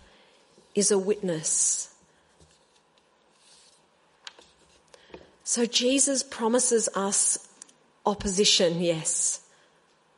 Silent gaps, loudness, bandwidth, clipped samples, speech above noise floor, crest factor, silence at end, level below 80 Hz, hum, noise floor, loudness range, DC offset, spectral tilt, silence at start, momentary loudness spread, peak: none; -24 LUFS; 11.5 kHz; under 0.1%; 39 dB; 22 dB; 0.8 s; -58 dBFS; none; -64 dBFS; 8 LU; under 0.1%; -2 dB/octave; 0.75 s; 14 LU; -6 dBFS